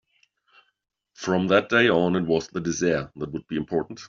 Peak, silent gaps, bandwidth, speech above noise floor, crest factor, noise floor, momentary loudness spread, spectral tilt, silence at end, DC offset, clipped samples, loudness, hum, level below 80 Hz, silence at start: -4 dBFS; none; 7.6 kHz; 43 dB; 20 dB; -67 dBFS; 12 LU; -4.5 dB/octave; 0 s; under 0.1%; under 0.1%; -24 LUFS; none; -58 dBFS; 1.2 s